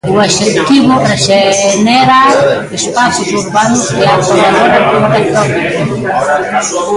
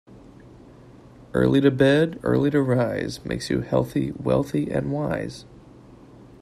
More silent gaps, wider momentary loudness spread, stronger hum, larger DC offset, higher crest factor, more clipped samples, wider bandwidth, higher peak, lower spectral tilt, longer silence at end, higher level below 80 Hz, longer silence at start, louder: neither; second, 6 LU vs 11 LU; neither; neither; second, 8 dB vs 18 dB; neither; second, 11.5 kHz vs 14 kHz; first, 0 dBFS vs -4 dBFS; second, -4 dB/octave vs -7 dB/octave; second, 0 s vs 0.2 s; first, -42 dBFS vs -48 dBFS; about the same, 0.05 s vs 0.1 s; first, -9 LUFS vs -23 LUFS